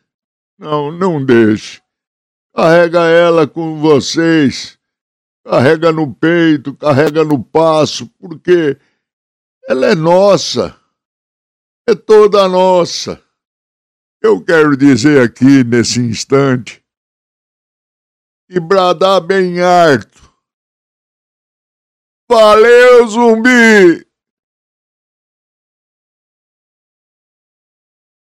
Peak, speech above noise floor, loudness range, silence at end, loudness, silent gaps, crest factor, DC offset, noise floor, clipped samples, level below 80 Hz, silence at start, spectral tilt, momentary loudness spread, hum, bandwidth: 0 dBFS; over 81 dB; 6 LU; 4.25 s; -10 LUFS; 2.07-2.50 s, 5.01-5.44 s, 9.13-9.61 s, 11.05-11.85 s, 13.47-14.20 s, 16.97-18.48 s, 20.53-22.27 s; 12 dB; under 0.1%; under -90 dBFS; 0.4%; -52 dBFS; 0.6 s; -5.5 dB/octave; 13 LU; none; 14 kHz